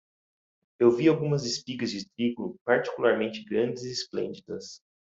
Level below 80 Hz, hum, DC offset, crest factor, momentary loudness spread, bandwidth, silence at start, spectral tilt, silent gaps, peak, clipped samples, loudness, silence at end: -70 dBFS; none; under 0.1%; 20 dB; 11 LU; 7.8 kHz; 0.8 s; -5.5 dB/octave; 2.61-2.65 s; -8 dBFS; under 0.1%; -27 LUFS; 0.4 s